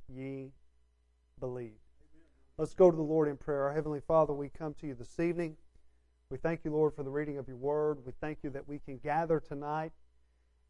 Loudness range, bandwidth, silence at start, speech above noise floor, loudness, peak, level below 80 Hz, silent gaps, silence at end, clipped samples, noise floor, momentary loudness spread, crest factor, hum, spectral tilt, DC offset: 5 LU; 11 kHz; 0 s; 38 dB; -34 LUFS; -12 dBFS; -58 dBFS; none; 0.75 s; under 0.1%; -70 dBFS; 15 LU; 22 dB; none; -8.5 dB/octave; under 0.1%